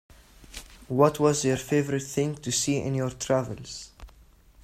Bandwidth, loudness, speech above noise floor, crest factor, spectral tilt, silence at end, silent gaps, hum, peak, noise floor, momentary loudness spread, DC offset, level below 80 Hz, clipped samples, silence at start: 16 kHz; -26 LUFS; 29 dB; 20 dB; -5 dB/octave; 0.55 s; none; none; -6 dBFS; -55 dBFS; 21 LU; under 0.1%; -52 dBFS; under 0.1%; 0.4 s